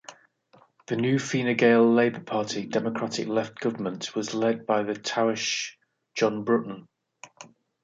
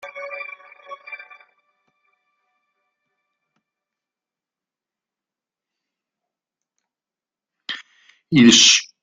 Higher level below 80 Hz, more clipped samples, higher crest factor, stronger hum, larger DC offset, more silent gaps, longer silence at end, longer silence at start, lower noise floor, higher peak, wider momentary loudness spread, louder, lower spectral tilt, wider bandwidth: second, -72 dBFS vs -64 dBFS; neither; second, 18 dB vs 24 dB; neither; neither; neither; first, 0.4 s vs 0.2 s; about the same, 0.1 s vs 0.05 s; second, -60 dBFS vs under -90 dBFS; second, -8 dBFS vs 0 dBFS; second, 12 LU vs 27 LU; second, -26 LUFS vs -12 LUFS; first, -4.5 dB/octave vs -2 dB/octave; second, 7.8 kHz vs 9.4 kHz